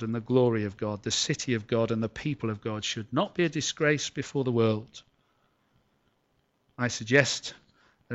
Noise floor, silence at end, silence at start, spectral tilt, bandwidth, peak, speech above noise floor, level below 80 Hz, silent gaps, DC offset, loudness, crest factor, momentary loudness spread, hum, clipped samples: -72 dBFS; 0 s; 0 s; -4.5 dB/octave; 8.2 kHz; -6 dBFS; 44 dB; -64 dBFS; none; under 0.1%; -28 LUFS; 24 dB; 9 LU; none; under 0.1%